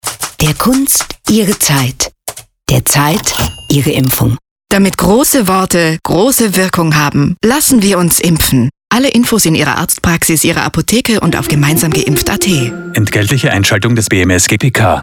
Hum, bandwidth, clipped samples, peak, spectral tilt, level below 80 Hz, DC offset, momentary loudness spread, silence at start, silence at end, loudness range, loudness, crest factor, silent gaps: none; over 20 kHz; under 0.1%; 0 dBFS; -4 dB/octave; -32 dBFS; under 0.1%; 5 LU; 0.05 s; 0 s; 2 LU; -10 LUFS; 10 dB; 4.51-4.56 s